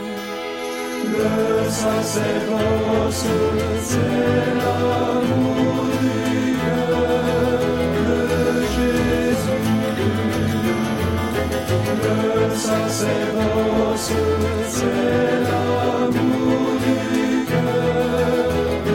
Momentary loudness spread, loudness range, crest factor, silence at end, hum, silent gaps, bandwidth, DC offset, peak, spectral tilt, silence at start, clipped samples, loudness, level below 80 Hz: 2 LU; 1 LU; 14 dB; 0 s; none; none; 16.5 kHz; under 0.1%; -6 dBFS; -5.5 dB/octave; 0 s; under 0.1%; -20 LUFS; -38 dBFS